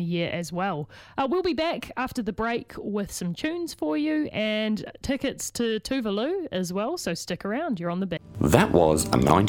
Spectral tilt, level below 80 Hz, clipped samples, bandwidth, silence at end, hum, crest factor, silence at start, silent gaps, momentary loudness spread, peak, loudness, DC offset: -5 dB/octave; -46 dBFS; under 0.1%; 18 kHz; 0 s; none; 24 dB; 0 s; none; 10 LU; -2 dBFS; -27 LUFS; under 0.1%